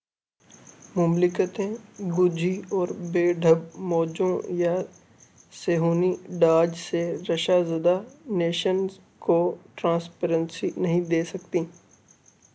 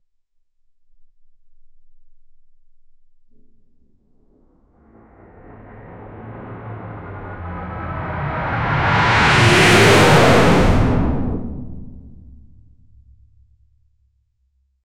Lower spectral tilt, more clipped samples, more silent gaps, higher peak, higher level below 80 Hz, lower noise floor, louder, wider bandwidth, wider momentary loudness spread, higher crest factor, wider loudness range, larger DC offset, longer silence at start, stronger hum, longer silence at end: first, -6.5 dB/octave vs -5 dB/octave; neither; neither; second, -8 dBFS vs -2 dBFS; second, -70 dBFS vs -32 dBFS; about the same, -65 dBFS vs -64 dBFS; second, -25 LUFS vs -14 LUFS; second, 8 kHz vs 16.5 kHz; second, 8 LU vs 26 LU; about the same, 18 dB vs 18 dB; second, 2 LU vs 22 LU; neither; second, 0.95 s vs 1.2 s; neither; second, 0.85 s vs 2.4 s